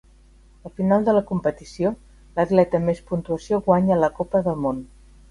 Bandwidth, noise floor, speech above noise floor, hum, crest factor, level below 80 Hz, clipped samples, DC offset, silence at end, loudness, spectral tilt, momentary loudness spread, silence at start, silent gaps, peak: 11 kHz; -51 dBFS; 30 dB; none; 20 dB; -48 dBFS; under 0.1%; under 0.1%; 0.45 s; -22 LUFS; -8.5 dB/octave; 9 LU; 0.65 s; none; -2 dBFS